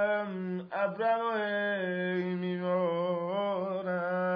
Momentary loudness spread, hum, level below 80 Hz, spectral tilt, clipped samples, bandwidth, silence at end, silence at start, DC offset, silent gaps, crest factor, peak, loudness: 4 LU; none; -80 dBFS; -9 dB/octave; under 0.1%; 5.4 kHz; 0 s; 0 s; under 0.1%; none; 12 dB; -18 dBFS; -32 LUFS